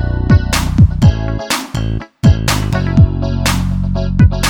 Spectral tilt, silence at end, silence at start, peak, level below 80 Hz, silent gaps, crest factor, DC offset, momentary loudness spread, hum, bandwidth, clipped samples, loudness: -5.5 dB/octave; 0 s; 0 s; 0 dBFS; -20 dBFS; none; 12 dB; under 0.1%; 7 LU; none; 17.5 kHz; under 0.1%; -14 LUFS